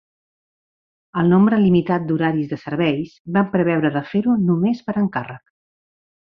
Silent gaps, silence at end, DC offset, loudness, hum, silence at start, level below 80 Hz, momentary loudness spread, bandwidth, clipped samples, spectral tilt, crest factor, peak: 3.20-3.25 s; 0.95 s; under 0.1%; -19 LUFS; none; 1.15 s; -58 dBFS; 10 LU; 5.8 kHz; under 0.1%; -9.5 dB/octave; 16 dB; -4 dBFS